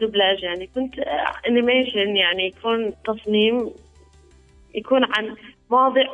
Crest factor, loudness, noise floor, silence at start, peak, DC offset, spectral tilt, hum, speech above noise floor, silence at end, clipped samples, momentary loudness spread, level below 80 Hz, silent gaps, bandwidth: 16 dB; -20 LUFS; -51 dBFS; 0 s; -6 dBFS; under 0.1%; -5.5 dB/octave; none; 31 dB; 0 s; under 0.1%; 10 LU; -54 dBFS; none; 8.6 kHz